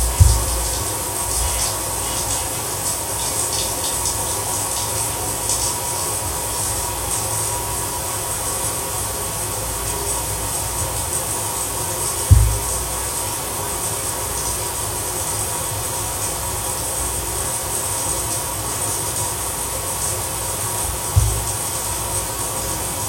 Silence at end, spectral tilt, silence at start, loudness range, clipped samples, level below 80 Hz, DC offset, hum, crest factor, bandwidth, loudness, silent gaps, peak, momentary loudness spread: 0 s; -2.5 dB/octave; 0 s; 2 LU; under 0.1%; -30 dBFS; under 0.1%; none; 22 dB; 16.5 kHz; -20 LUFS; none; 0 dBFS; 3 LU